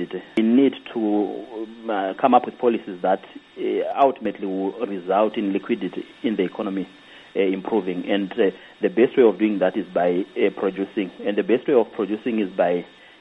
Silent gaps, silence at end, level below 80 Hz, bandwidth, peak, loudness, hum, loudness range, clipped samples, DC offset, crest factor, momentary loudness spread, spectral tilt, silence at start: none; 0.35 s; -68 dBFS; 5.8 kHz; -2 dBFS; -22 LUFS; none; 4 LU; under 0.1%; under 0.1%; 20 dB; 10 LU; -8 dB/octave; 0 s